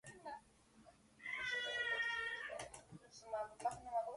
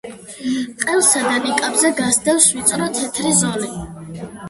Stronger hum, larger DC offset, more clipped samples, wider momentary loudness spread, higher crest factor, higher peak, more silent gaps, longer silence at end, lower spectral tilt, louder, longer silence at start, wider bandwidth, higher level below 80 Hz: neither; neither; neither; about the same, 17 LU vs 18 LU; about the same, 18 dB vs 18 dB; second, -28 dBFS vs 0 dBFS; neither; about the same, 0 s vs 0 s; about the same, -1.5 dB/octave vs -2.5 dB/octave; second, -43 LUFS vs -16 LUFS; about the same, 0.05 s vs 0.05 s; about the same, 11.5 kHz vs 12 kHz; second, -74 dBFS vs -50 dBFS